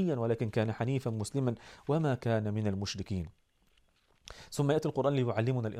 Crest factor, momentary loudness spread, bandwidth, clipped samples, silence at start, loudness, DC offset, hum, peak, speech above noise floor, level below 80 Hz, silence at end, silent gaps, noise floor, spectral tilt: 18 dB; 10 LU; 13.5 kHz; under 0.1%; 0 s; -33 LUFS; under 0.1%; none; -16 dBFS; 37 dB; -60 dBFS; 0 s; none; -69 dBFS; -7 dB/octave